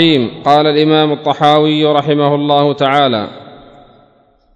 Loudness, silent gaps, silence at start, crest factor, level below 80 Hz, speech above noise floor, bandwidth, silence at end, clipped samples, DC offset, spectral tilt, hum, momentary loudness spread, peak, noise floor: -11 LUFS; none; 0 s; 12 dB; -52 dBFS; 40 dB; 8 kHz; 1 s; 0.2%; under 0.1%; -7 dB/octave; none; 4 LU; 0 dBFS; -51 dBFS